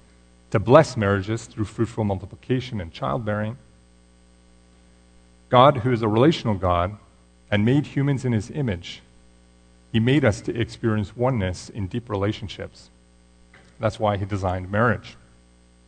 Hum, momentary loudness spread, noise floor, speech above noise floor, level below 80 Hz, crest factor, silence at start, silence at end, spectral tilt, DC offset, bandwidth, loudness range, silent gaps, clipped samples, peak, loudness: 60 Hz at -50 dBFS; 15 LU; -54 dBFS; 32 dB; -48 dBFS; 24 dB; 0.5 s; 0.75 s; -7 dB/octave; under 0.1%; 9.4 kHz; 7 LU; none; under 0.1%; 0 dBFS; -23 LUFS